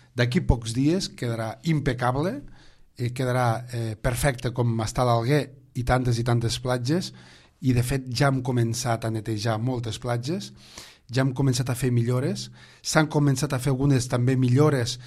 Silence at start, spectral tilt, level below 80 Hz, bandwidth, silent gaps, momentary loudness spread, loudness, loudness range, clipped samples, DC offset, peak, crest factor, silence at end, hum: 0.15 s; -6 dB/octave; -40 dBFS; 14.5 kHz; none; 9 LU; -25 LUFS; 3 LU; under 0.1%; under 0.1%; -4 dBFS; 20 dB; 0 s; none